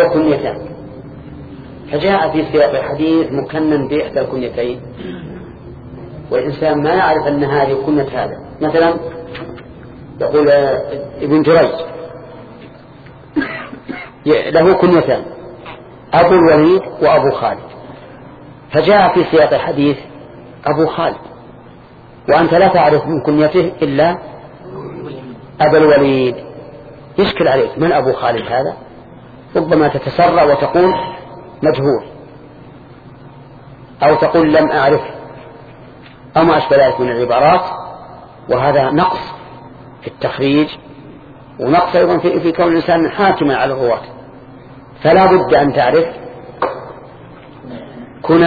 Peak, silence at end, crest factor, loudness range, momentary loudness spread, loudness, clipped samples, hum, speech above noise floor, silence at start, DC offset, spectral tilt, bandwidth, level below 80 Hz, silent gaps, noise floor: 0 dBFS; 0 s; 14 dB; 4 LU; 22 LU; -13 LUFS; under 0.1%; none; 26 dB; 0 s; under 0.1%; -9 dB/octave; 4.9 kHz; -44 dBFS; none; -39 dBFS